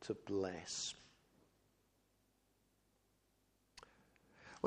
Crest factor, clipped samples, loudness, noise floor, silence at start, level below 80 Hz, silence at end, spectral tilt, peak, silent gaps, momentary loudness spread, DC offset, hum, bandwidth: 32 dB; under 0.1%; -43 LUFS; -79 dBFS; 0 s; -80 dBFS; 0 s; -3.5 dB/octave; -16 dBFS; none; 21 LU; under 0.1%; none; 14.5 kHz